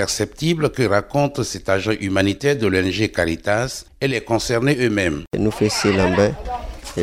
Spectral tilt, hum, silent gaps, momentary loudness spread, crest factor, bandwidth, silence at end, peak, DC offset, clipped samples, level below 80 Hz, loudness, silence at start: -5 dB/octave; none; 5.27-5.31 s; 6 LU; 18 dB; 16 kHz; 0 s; -2 dBFS; under 0.1%; under 0.1%; -40 dBFS; -20 LUFS; 0 s